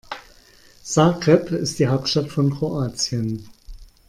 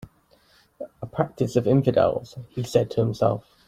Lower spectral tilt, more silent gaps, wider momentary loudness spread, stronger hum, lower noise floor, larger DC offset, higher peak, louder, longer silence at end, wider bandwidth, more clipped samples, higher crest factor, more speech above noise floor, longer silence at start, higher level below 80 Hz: second, -5.5 dB/octave vs -7.5 dB/octave; neither; about the same, 16 LU vs 16 LU; neither; second, -51 dBFS vs -60 dBFS; neither; about the same, -2 dBFS vs -4 dBFS; first, -20 LUFS vs -23 LUFS; about the same, 0.25 s vs 0.25 s; about the same, 14 kHz vs 15 kHz; neither; about the same, 20 dB vs 20 dB; second, 31 dB vs 37 dB; second, 0.1 s vs 0.8 s; first, -48 dBFS vs -56 dBFS